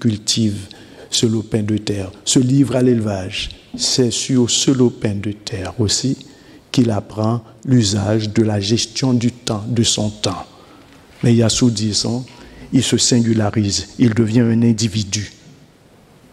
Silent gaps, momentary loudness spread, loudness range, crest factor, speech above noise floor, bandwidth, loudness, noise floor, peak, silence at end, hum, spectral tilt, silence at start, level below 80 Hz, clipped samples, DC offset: none; 10 LU; 2 LU; 16 dB; 31 dB; 13.5 kHz; -17 LUFS; -48 dBFS; -2 dBFS; 1 s; none; -4.5 dB/octave; 0 s; -46 dBFS; under 0.1%; under 0.1%